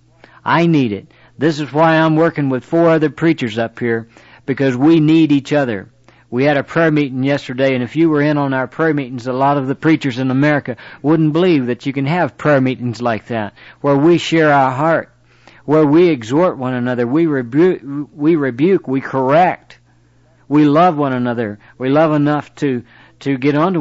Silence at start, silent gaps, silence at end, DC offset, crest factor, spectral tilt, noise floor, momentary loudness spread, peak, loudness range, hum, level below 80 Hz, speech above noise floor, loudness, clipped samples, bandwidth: 0.45 s; none; 0 s; under 0.1%; 12 dB; -7.5 dB/octave; -51 dBFS; 10 LU; -4 dBFS; 2 LU; none; -58 dBFS; 37 dB; -15 LUFS; under 0.1%; 8 kHz